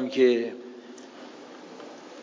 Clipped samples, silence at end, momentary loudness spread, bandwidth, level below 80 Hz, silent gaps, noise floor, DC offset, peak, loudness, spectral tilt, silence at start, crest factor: under 0.1%; 0 s; 23 LU; 7.6 kHz; under -90 dBFS; none; -45 dBFS; under 0.1%; -10 dBFS; -24 LUFS; -5 dB/octave; 0 s; 18 dB